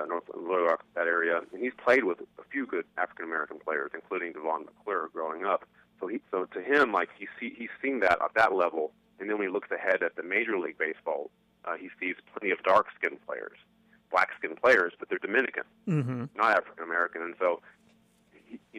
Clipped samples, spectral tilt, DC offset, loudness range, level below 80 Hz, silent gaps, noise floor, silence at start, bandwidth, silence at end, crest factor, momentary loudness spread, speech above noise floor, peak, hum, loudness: under 0.1%; -6.5 dB/octave; under 0.1%; 5 LU; -72 dBFS; none; -64 dBFS; 0 s; 12.5 kHz; 0 s; 20 dB; 13 LU; 34 dB; -10 dBFS; 60 Hz at -75 dBFS; -29 LUFS